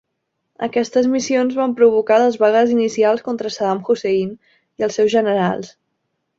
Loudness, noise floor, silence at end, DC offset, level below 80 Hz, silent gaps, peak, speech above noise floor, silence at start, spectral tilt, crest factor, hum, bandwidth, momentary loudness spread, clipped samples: -17 LUFS; -74 dBFS; 0.7 s; under 0.1%; -62 dBFS; none; -2 dBFS; 57 dB; 0.6 s; -5 dB/octave; 16 dB; none; 7.8 kHz; 10 LU; under 0.1%